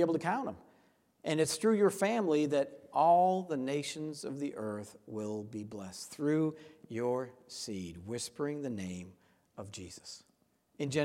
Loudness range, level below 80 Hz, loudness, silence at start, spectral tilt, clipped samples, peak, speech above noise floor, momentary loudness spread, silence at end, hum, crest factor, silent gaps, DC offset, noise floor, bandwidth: 10 LU; -74 dBFS; -34 LUFS; 0 s; -5 dB/octave; under 0.1%; -16 dBFS; 39 dB; 18 LU; 0 s; none; 18 dB; none; under 0.1%; -73 dBFS; 16 kHz